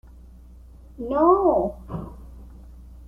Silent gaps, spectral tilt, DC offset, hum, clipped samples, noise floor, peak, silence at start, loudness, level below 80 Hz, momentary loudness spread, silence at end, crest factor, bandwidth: none; -10 dB/octave; under 0.1%; none; under 0.1%; -45 dBFS; -4 dBFS; 0.95 s; -20 LUFS; -42 dBFS; 22 LU; 0.05 s; 20 dB; 3.6 kHz